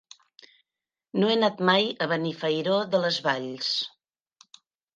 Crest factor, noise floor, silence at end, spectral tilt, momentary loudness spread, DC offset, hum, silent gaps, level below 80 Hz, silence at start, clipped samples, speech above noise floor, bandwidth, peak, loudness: 20 dB; under -90 dBFS; 1.1 s; -5 dB/octave; 6 LU; under 0.1%; none; none; -78 dBFS; 1.15 s; under 0.1%; over 65 dB; 9.2 kHz; -6 dBFS; -25 LUFS